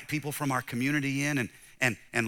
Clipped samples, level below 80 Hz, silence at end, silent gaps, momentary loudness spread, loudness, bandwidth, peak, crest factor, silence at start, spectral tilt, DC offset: under 0.1%; -66 dBFS; 0 s; none; 5 LU; -30 LUFS; 18.5 kHz; -10 dBFS; 22 dB; 0 s; -4.5 dB/octave; under 0.1%